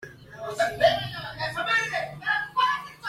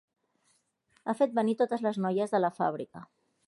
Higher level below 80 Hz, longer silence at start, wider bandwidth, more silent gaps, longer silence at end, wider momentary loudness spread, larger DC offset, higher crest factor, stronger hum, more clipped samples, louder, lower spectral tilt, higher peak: first, -58 dBFS vs -80 dBFS; second, 0 s vs 1.05 s; first, 16 kHz vs 11.5 kHz; neither; second, 0 s vs 0.45 s; about the same, 12 LU vs 13 LU; neither; about the same, 20 dB vs 18 dB; neither; neither; first, -25 LUFS vs -30 LUFS; second, -3 dB/octave vs -7 dB/octave; first, -8 dBFS vs -14 dBFS